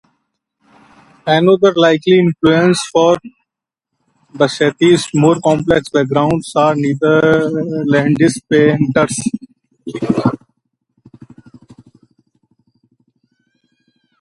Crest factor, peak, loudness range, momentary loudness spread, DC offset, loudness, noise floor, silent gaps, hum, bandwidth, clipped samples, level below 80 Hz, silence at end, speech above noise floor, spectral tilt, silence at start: 14 dB; 0 dBFS; 10 LU; 9 LU; under 0.1%; -13 LUFS; -81 dBFS; none; none; 11.5 kHz; under 0.1%; -50 dBFS; 3.85 s; 68 dB; -6 dB/octave; 1.25 s